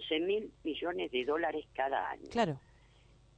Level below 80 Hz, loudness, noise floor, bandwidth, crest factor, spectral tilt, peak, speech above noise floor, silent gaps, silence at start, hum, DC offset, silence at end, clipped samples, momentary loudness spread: -64 dBFS; -35 LUFS; -63 dBFS; 9 kHz; 20 dB; -5.5 dB/octave; -16 dBFS; 28 dB; none; 0 s; none; under 0.1%; 0.8 s; under 0.1%; 5 LU